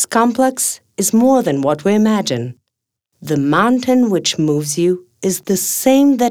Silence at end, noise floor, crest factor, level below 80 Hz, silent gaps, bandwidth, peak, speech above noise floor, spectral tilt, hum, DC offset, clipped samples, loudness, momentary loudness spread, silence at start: 0 s; -77 dBFS; 14 dB; -60 dBFS; none; over 20 kHz; 0 dBFS; 63 dB; -4.5 dB/octave; none; under 0.1%; under 0.1%; -15 LUFS; 9 LU; 0 s